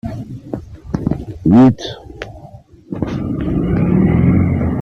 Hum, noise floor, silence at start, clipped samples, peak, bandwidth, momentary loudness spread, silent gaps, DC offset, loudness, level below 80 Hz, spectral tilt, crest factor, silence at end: none; -39 dBFS; 0.05 s; under 0.1%; -2 dBFS; 6.8 kHz; 20 LU; none; under 0.1%; -15 LUFS; -32 dBFS; -9 dB/octave; 14 dB; 0 s